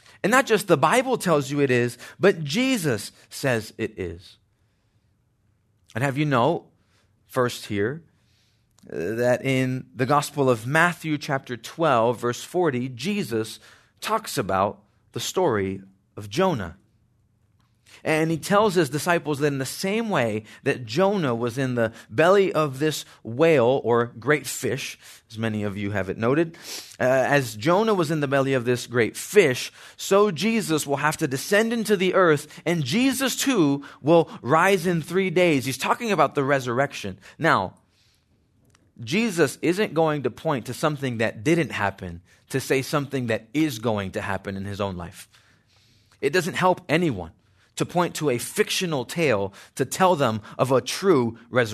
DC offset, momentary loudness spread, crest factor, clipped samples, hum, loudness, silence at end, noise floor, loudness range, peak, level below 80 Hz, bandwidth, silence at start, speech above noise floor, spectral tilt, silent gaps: under 0.1%; 11 LU; 20 dB; under 0.1%; none; -23 LUFS; 0 s; -66 dBFS; 6 LU; -4 dBFS; -64 dBFS; 14 kHz; 0.25 s; 43 dB; -5 dB/octave; none